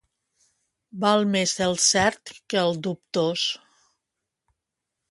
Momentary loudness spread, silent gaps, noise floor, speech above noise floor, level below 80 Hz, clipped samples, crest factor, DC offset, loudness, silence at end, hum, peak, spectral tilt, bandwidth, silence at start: 12 LU; none; -84 dBFS; 60 dB; -60 dBFS; under 0.1%; 20 dB; under 0.1%; -23 LUFS; 1.55 s; none; -6 dBFS; -3 dB/octave; 11.5 kHz; 0.95 s